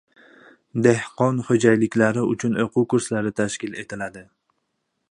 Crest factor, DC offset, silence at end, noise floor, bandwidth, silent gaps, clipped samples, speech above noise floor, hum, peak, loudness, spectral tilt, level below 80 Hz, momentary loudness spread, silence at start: 20 dB; under 0.1%; 0.9 s; -75 dBFS; 11 kHz; none; under 0.1%; 54 dB; none; -2 dBFS; -21 LUFS; -6 dB/octave; -60 dBFS; 13 LU; 0.75 s